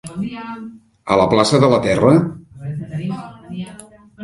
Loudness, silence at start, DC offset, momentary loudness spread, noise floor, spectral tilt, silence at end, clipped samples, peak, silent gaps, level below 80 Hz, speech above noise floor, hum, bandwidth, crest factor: -16 LUFS; 0.05 s; under 0.1%; 20 LU; -41 dBFS; -6 dB/octave; 0 s; under 0.1%; 0 dBFS; none; -46 dBFS; 25 dB; none; 11.5 kHz; 18 dB